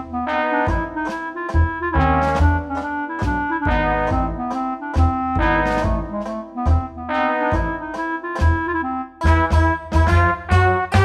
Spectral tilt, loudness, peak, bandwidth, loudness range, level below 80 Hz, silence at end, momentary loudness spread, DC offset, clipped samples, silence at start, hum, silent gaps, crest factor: -7.5 dB/octave; -20 LUFS; -2 dBFS; 9.4 kHz; 2 LU; -26 dBFS; 0 s; 8 LU; under 0.1%; under 0.1%; 0 s; none; none; 16 dB